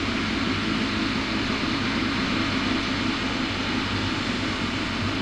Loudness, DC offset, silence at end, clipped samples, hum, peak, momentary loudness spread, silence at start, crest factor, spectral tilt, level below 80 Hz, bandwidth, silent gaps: -25 LUFS; under 0.1%; 0 s; under 0.1%; none; -12 dBFS; 2 LU; 0 s; 12 dB; -4.5 dB/octave; -42 dBFS; 11.5 kHz; none